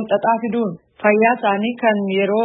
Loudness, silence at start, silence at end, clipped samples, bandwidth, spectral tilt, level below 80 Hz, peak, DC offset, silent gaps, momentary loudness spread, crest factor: -18 LUFS; 0 s; 0 s; under 0.1%; 4 kHz; -11 dB/octave; -68 dBFS; -2 dBFS; under 0.1%; none; 7 LU; 16 dB